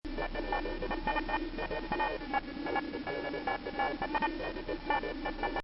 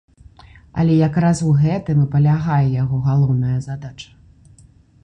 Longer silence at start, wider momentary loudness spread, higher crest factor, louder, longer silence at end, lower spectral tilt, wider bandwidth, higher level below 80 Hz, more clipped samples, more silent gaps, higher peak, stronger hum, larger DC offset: second, 0.05 s vs 0.75 s; second, 5 LU vs 14 LU; about the same, 16 dB vs 12 dB; second, -35 LUFS vs -17 LUFS; second, 0 s vs 1 s; second, -2.5 dB/octave vs -8 dB/octave; second, 5.6 kHz vs 9.6 kHz; about the same, -44 dBFS vs -44 dBFS; neither; neither; second, -18 dBFS vs -6 dBFS; neither; neither